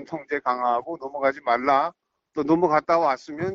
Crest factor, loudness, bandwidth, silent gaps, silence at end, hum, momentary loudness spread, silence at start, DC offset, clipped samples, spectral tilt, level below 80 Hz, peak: 16 dB; -23 LUFS; 7.4 kHz; none; 0 s; none; 10 LU; 0 s; under 0.1%; under 0.1%; -6.5 dB/octave; -64 dBFS; -6 dBFS